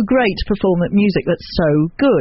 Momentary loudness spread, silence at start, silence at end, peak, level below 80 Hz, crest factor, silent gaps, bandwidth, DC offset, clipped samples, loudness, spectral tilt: 4 LU; 0 s; 0 s; -4 dBFS; -32 dBFS; 12 dB; none; 6 kHz; under 0.1%; under 0.1%; -16 LUFS; -6 dB/octave